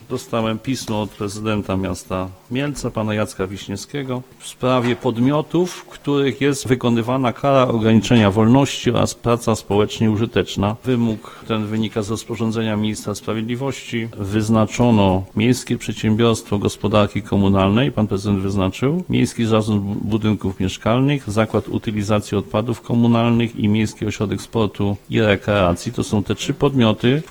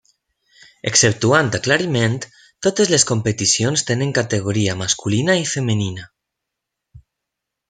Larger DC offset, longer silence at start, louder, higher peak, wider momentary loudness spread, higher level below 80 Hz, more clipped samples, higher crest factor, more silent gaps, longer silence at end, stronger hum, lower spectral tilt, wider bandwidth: neither; second, 0 s vs 0.85 s; about the same, -19 LUFS vs -17 LUFS; about the same, 0 dBFS vs 0 dBFS; about the same, 9 LU vs 8 LU; first, -44 dBFS vs -54 dBFS; neither; about the same, 18 dB vs 20 dB; neither; second, 0 s vs 0.7 s; neither; first, -6 dB/octave vs -3.5 dB/octave; first, over 20 kHz vs 9.6 kHz